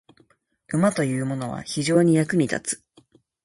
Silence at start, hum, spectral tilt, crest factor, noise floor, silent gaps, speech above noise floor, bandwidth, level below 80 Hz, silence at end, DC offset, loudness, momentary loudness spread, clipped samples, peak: 0.7 s; none; -5.5 dB/octave; 18 dB; -62 dBFS; none; 40 dB; 11.5 kHz; -62 dBFS; 0.7 s; under 0.1%; -23 LUFS; 11 LU; under 0.1%; -6 dBFS